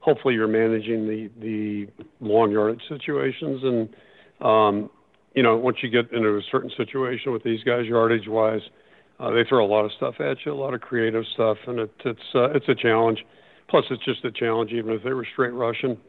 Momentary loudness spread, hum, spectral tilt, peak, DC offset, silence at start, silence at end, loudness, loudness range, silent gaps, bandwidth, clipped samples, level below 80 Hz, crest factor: 10 LU; none; -9 dB/octave; -4 dBFS; under 0.1%; 0 s; 0.1 s; -23 LUFS; 2 LU; none; 4.4 kHz; under 0.1%; -70 dBFS; 18 dB